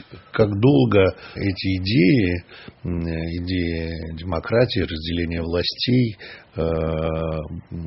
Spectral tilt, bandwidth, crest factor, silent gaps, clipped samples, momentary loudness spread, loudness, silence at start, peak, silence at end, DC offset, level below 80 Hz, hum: -5.5 dB/octave; 6 kHz; 18 dB; none; under 0.1%; 13 LU; -22 LUFS; 0.1 s; -4 dBFS; 0 s; under 0.1%; -38 dBFS; none